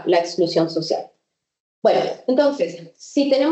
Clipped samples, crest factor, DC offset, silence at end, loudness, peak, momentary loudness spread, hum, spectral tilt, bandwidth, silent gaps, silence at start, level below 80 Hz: under 0.1%; 16 dB; under 0.1%; 0 s; -20 LUFS; -4 dBFS; 8 LU; none; -5 dB/octave; 8.4 kHz; 1.60-1.82 s; 0 s; -76 dBFS